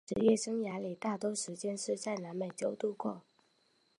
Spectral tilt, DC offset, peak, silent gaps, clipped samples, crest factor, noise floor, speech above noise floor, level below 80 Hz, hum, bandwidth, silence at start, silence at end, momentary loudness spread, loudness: -4.5 dB/octave; under 0.1%; -16 dBFS; none; under 0.1%; 20 dB; -73 dBFS; 38 dB; -72 dBFS; none; 11.5 kHz; 0.1 s; 0.8 s; 10 LU; -36 LUFS